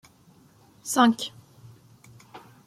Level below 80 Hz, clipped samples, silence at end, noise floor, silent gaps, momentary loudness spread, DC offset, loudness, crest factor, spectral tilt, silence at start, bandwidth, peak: -70 dBFS; under 0.1%; 0.3 s; -57 dBFS; none; 27 LU; under 0.1%; -23 LUFS; 24 dB; -3 dB/octave; 0.85 s; 15.5 kHz; -6 dBFS